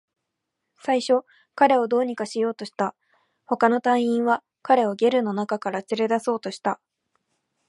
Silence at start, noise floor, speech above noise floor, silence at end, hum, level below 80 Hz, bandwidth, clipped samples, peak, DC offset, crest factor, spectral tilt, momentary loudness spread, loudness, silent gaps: 0.85 s; -81 dBFS; 59 dB; 0.95 s; none; -76 dBFS; 11.5 kHz; under 0.1%; -4 dBFS; under 0.1%; 20 dB; -5 dB/octave; 9 LU; -23 LUFS; none